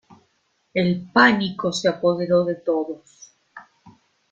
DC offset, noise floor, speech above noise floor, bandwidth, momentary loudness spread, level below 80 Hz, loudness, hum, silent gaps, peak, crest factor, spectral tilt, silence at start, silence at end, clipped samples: under 0.1%; -67 dBFS; 47 dB; 9 kHz; 11 LU; -62 dBFS; -20 LUFS; none; none; -2 dBFS; 22 dB; -5.5 dB/octave; 0.75 s; 0.7 s; under 0.1%